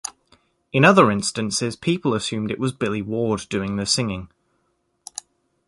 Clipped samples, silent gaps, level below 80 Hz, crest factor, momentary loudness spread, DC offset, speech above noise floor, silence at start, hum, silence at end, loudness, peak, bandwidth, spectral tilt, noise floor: under 0.1%; none; -52 dBFS; 22 dB; 20 LU; under 0.1%; 49 dB; 0.05 s; none; 1.4 s; -21 LUFS; -2 dBFS; 11.5 kHz; -4.5 dB/octave; -69 dBFS